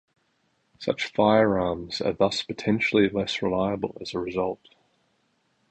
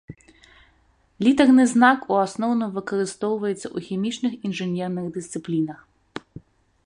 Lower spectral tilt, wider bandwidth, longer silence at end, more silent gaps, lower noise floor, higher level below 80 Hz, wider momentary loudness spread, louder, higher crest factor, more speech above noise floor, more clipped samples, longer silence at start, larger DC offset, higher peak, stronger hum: about the same, -5.5 dB/octave vs -5.5 dB/octave; second, 9 kHz vs 10.5 kHz; first, 1.15 s vs 0.45 s; neither; first, -70 dBFS vs -61 dBFS; first, -54 dBFS vs -62 dBFS; second, 10 LU vs 15 LU; second, -25 LUFS vs -22 LUFS; about the same, 20 dB vs 20 dB; first, 46 dB vs 40 dB; neither; first, 0.8 s vs 0.1 s; neither; about the same, -6 dBFS vs -4 dBFS; neither